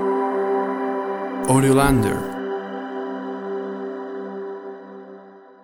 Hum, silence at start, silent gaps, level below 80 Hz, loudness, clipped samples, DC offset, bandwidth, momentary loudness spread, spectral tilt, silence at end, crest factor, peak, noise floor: none; 0 s; none; -42 dBFS; -23 LUFS; under 0.1%; under 0.1%; 16.5 kHz; 20 LU; -6 dB/octave; 0.1 s; 20 dB; -2 dBFS; -44 dBFS